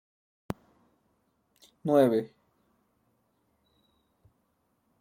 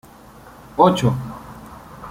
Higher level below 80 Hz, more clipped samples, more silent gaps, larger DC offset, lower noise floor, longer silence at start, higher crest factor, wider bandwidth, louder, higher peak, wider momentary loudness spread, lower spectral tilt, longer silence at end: second, -68 dBFS vs -48 dBFS; neither; neither; neither; first, -74 dBFS vs -43 dBFS; first, 1.85 s vs 0.75 s; about the same, 22 dB vs 20 dB; about the same, 16.5 kHz vs 16 kHz; second, -26 LUFS vs -18 LUFS; second, -10 dBFS vs -2 dBFS; second, 18 LU vs 24 LU; about the same, -7.5 dB/octave vs -7 dB/octave; first, 2.75 s vs 0 s